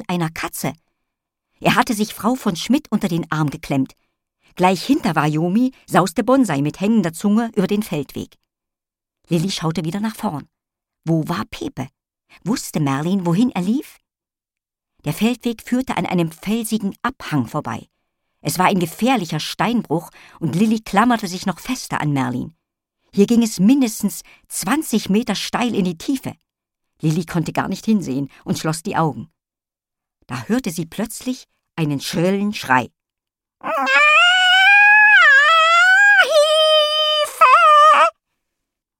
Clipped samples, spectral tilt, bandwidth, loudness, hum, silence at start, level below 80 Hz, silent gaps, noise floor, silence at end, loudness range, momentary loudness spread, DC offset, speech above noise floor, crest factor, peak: under 0.1%; -4.5 dB/octave; 17 kHz; -16 LUFS; none; 0 s; -54 dBFS; none; -89 dBFS; 0.9 s; 13 LU; 17 LU; under 0.1%; 70 dB; 18 dB; -2 dBFS